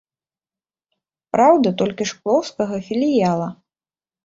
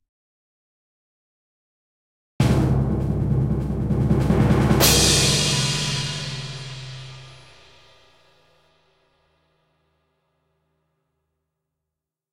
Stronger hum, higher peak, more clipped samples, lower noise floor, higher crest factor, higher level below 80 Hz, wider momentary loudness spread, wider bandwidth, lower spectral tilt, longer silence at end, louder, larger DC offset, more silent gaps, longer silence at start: neither; about the same, -2 dBFS vs -2 dBFS; neither; first, under -90 dBFS vs -85 dBFS; about the same, 18 dB vs 22 dB; second, -60 dBFS vs -36 dBFS; second, 10 LU vs 19 LU; second, 7.8 kHz vs 16.5 kHz; first, -6 dB/octave vs -4 dB/octave; second, 0.7 s vs 4.95 s; about the same, -19 LUFS vs -19 LUFS; neither; neither; second, 1.35 s vs 2.4 s